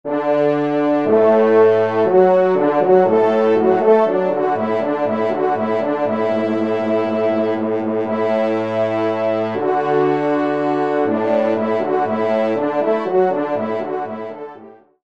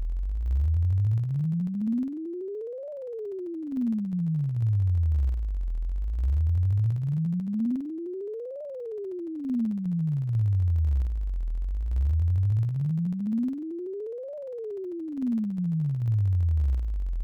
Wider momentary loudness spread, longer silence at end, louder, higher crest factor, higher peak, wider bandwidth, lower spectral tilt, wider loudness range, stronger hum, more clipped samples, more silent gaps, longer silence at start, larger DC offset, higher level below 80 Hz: second, 7 LU vs 10 LU; first, 0.35 s vs 0 s; first, -17 LUFS vs -29 LUFS; first, 16 dB vs 6 dB; first, 0 dBFS vs -20 dBFS; first, 7 kHz vs 3 kHz; second, -8 dB/octave vs -11.5 dB/octave; about the same, 5 LU vs 3 LU; neither; neither; neither; about the same, 0.05 s vs 0 s; first, 0.3% vs under 0.1%; second, -66 dBFS vs -32 dBFS